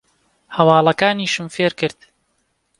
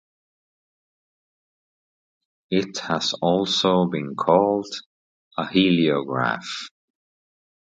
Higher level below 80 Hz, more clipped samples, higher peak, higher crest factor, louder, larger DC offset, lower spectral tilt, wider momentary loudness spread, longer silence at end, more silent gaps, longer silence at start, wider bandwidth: about the same, -62 dBFS vs -64 dBFS; neither; about the same, 0 dBFS vs -2 dBFS; about the same, 18 dB vs 22 dB; first, -17 LUFS vs -22 LUFS; neither; about the same, -5 dB/octave vs -5 dB/octave; second, 11 LU vs 14 LU; second, 0.9 s vs 1.1 s; second, none vs 4.86-5.31 s; second, 0.5 s vs 2.5 s; first, 11.5 kHz vs 9 kHz